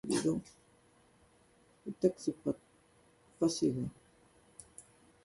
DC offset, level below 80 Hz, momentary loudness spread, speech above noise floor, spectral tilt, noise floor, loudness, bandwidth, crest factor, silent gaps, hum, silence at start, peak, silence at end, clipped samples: under 0.1%; -68 dBFS; 23 LU; 33 dB; -5.5 dB/octave; -67 dBFS; -35 LUFS; 11.5 kHz; 22 dB; none; none; 0.05 s; -16 dBFS; 0.45 s; under 0.1%